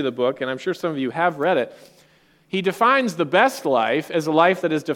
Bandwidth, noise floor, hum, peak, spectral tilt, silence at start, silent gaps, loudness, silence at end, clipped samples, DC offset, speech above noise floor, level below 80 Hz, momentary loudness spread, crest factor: 17 kHz; -57 dBFS; none; -2 dBFS; -5 dB/octave; 0 s; none; -20 LUFS; 0 s; under 0.1%; under 0.1%; 36 dB; -70 dBFS; 8 LU; 18 dB